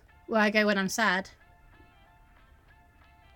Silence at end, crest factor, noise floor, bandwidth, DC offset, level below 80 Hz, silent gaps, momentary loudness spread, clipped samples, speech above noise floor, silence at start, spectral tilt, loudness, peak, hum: 2.05 s; 20 dB; -58 dBFS; 17.5 kHz; under 0.1%; -62 dBFS; none; 8 LU; under 0.1%; 32 dB; 0.3 s; -4 dB/octave; -26 LUFS; -10 dBFS; none